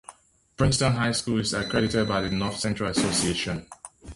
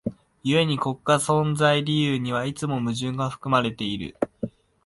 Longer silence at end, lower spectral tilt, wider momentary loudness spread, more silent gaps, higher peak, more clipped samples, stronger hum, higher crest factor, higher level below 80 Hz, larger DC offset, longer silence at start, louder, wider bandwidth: second, 0 s vs 0.35 s; about the same, -4.5 dB/octave vs -5.5 dB/octave; about the same, 8 LU vs 10 LU; neither; about the same, -8 dBFS vs -6 dBFS; neither; neither; about the same, 18 dB vs 18 dB; first, -44 dBFS vs -56 dBFS; neither; about the same, 0.1 s vs 0.05 s; about the same, -25 LUFS vs -24 LUFS; about the same, 11.5 kHz vs 11.5 kHz